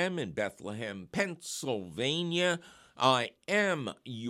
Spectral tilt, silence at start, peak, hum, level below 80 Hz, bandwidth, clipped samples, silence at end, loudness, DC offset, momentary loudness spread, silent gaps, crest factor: -4 dB/octave; 0 s; -10 dBFS; none; -70 dBFS; 16 kHz; under 0.1%; 0 s; -32 LUFS; under 0.1%; 11 LU; none; 22 dB